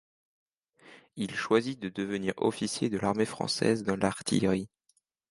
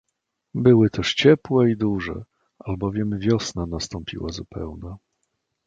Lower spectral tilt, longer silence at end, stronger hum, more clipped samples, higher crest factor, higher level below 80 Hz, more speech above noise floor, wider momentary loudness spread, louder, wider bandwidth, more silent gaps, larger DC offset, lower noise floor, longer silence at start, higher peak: about the same, -5 dB/octave vs -6 dB/octave; about the same, 0.65 s vs 0.7 s; neither; neither; about the same, 20 dB vs 20 dB; second, -62 dBFS vs -44 dBFS; second, 44 dB vs 57 dB; second, 8 LU vs 17 LU; second, -30 LUFS vs -21 LUFS; first, 11.5 kHz vs 8.8 kHz; neither; neither; second, -73 dBFS vs -78 dBFS; first, 0.85 s vs 0.55 s; second, -10 dBFS vs -2 dBFS